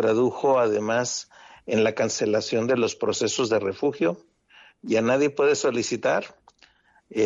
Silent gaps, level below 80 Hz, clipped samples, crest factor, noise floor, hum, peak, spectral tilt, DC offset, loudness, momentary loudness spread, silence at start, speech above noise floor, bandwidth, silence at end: none; -68 dBFS; under 0.1%; 14 dB; -59 dBFS; none; -10 dBFS; -4 dB/octave; under 0.1%; -24 LUFS; 11 LU; 0 s; 36 dB; 7.8 kHz; 0 s